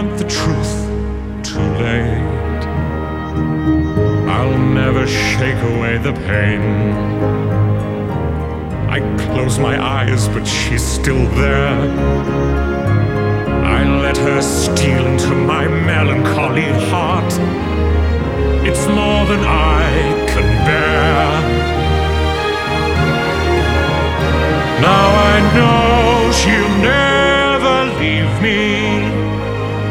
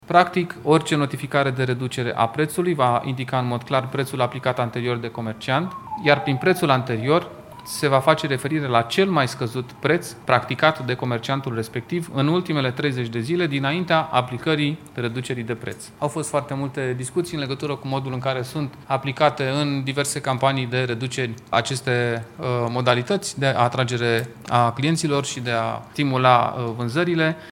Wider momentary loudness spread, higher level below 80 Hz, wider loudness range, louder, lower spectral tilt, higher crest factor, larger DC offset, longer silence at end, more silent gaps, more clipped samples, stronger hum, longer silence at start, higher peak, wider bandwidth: about the same, 7 LU vs 8 LU; first, -22 dBFS vs -60 dBFS; about the same, 5 LU vs 4 LU; first, -15 LUFS vs -22 LUFS; about the same, -5.5 dB/octave vs -5.5 dB/octave; second, 14 dB vs 22 dB; neither; about the same, 0 s vs 0 s; neither; neither; neither; about the same, 0 s vs 0.05 s; about the same, 0 dBFS vs 0 dBFS; about the same, 15.5 kHz vs 17 kHz